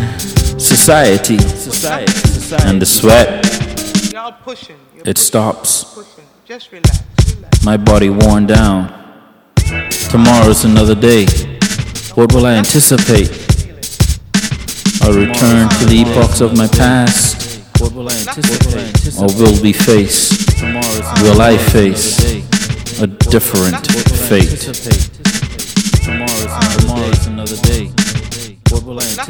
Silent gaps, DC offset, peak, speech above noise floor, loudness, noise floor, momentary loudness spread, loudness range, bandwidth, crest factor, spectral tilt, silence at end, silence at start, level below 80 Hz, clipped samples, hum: none; under 0.1%; 0 dBFS; 31 dB; -11 LUFS; -41 dBFS; 9 LU; 5 LU; over 20 kHz; 10 dB; -4.5 dB/octave; 0 s; 0 s; -20 dBFS; 1%; none